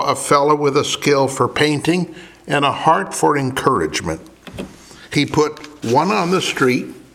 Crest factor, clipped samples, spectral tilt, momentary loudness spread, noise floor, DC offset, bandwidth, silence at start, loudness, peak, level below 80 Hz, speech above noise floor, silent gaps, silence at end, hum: 18 dB; under 0.1%; -4.5 dB/octave; 14 LU; -37 dBFS; under 0.1%; 16.5 kHz; 0 s; -17 LUFS; 0 dBFS; -50 dBFS; 21 dB; none; 0.15 s; none